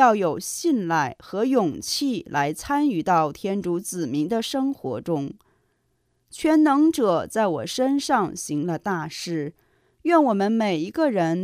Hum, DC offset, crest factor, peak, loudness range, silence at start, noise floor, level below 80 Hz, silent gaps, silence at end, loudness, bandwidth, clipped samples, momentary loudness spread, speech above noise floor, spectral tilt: none; under 0.1%; 18 dB; -6 dBFS; 3 LU; 0 s; -70 dBFS; -60 dBFS; none; 0 s; -23 LUFS; 15.5 kHz; under 0.1%; 9 LU; 47 dB; -5 dB/octave